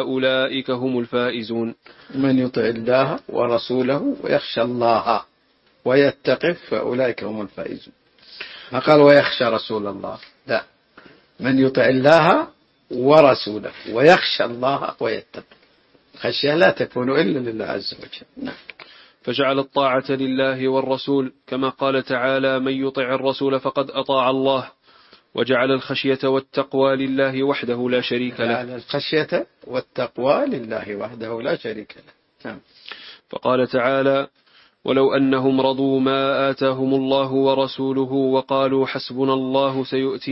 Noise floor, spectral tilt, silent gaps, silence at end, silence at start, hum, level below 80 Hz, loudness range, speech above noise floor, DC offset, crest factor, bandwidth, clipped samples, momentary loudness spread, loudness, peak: -60 dBFS; -7 dB/octave; none; 0 s; 0 s; none; -62 dBFS; 6 LU; 41 dB; under 0.1%; 20 dB; 7.8 kHz; under 0.1%; 15 LU; -20 LUFS; 0 dBFS